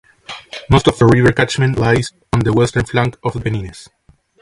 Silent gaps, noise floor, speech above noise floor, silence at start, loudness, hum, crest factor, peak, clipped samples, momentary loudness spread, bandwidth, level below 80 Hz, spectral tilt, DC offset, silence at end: none; -35 dBFS; 20 dB; 0.3 s; -15 LUFS; none; 16 dB; 0 dBFS; under 0.1%; 18 LU; 11.5 kHz; -34 dBFS; -6 dB/octave; under 0.1%; 0.6 s